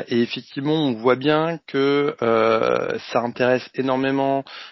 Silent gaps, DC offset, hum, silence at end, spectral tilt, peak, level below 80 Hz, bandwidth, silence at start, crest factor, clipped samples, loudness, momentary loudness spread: none; under 0.1%; none; 0 s; -7 dB/octave; -4 dBFS; -62 dBFS; 6 kHz; 0 s; 18 dB; under 0.1%; -21 LUFS; 6 LU